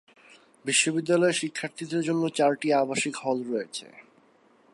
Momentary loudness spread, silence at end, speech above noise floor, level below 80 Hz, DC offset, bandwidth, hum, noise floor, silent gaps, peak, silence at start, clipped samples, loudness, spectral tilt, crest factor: 11 LU; 0.75 s; 35 dB; -78 dBFS; under 0.1%; 11.5 kHz; none; -61 dBFS; none; -10 dBFS; 0.65 s; under 0.1%; -26 LUFS; -3.5 dB/octave; 18 dB